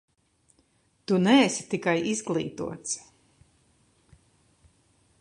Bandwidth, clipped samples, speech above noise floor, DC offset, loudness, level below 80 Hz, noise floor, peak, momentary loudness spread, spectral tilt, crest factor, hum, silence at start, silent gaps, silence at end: 11 kHz; under 0.1%; 42 dB; under 0.1%; -26 LUFS; -66 dBFS; -67 dBFS; -8 dBFS; 14 LU; -4.5 dB/octave; 22 dB; none; 1.1 s; none; 2.2 s